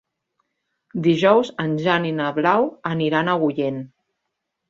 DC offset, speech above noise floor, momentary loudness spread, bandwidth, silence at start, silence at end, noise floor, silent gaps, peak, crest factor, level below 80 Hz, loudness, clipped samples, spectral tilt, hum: under 0.1%; 59 dB; 9 LU; 7.6 kHz; 0.95 s; 0.85 s; -78 dBFS; none; -2 dBFS; 20 dB; -64 dBFS; -20 LUFS; under 0.1%; -7 dB/octave; none